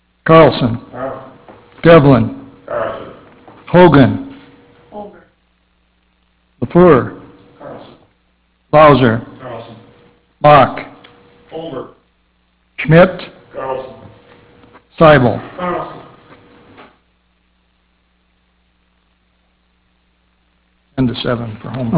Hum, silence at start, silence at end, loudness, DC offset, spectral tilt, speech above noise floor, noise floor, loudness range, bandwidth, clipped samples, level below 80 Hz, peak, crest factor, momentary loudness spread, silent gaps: none; 0.25 s; 0 s; -11 LUFS; under 0.1%; -11 dB/octave; 49 dB; -59 dBFS; 5 LU; 4 kHz; 0.3%; -42 dBFS; 0 dBFS; 14 dB; 25 LU; none